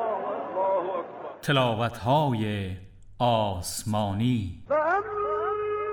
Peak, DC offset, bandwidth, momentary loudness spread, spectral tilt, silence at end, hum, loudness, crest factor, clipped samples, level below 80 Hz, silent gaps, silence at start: -12 dBFS; under 0.1%; 18 kHz; 9 LU; -5.5 dB/octave; 0 s; none; -27 LUFS; 16 dB; under 0.1%; -54 dBFS; none; 0 s